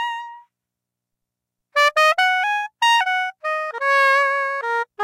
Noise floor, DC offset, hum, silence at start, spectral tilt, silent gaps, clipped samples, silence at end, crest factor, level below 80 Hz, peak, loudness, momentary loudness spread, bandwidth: -84 dBFS; under 0.1%; 60 Hz at -90 dBFS; 0 s; 3.5 dB/octave; none; under 0.1%; 0 s; 14 dB; -78 dBFS; -8 dBFS; -18 LUFS; 10 LU; 16 kHz